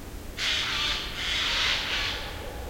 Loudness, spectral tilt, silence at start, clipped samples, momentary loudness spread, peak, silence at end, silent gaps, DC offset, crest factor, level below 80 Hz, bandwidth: -26 LUFS; -1.5 dB/octave; 0 s; under 0.1%; 9 LU; -12 dBFS; 0 s; none; under 0.1%; 18 dB; -40 dBFS; 16.5 kHz